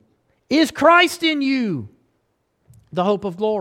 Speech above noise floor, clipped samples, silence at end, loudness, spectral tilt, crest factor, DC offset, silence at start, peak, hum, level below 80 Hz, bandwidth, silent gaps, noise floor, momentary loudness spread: 51 dB; under 0.1%; 0 s; -18 LUFS; -4.5 dB/octave; 18 dB; under 0.1%; 0.5 s; -2 dBFS; none; -60 dBFS; 16.5 kHz; none; -68 dBFS; 12 LU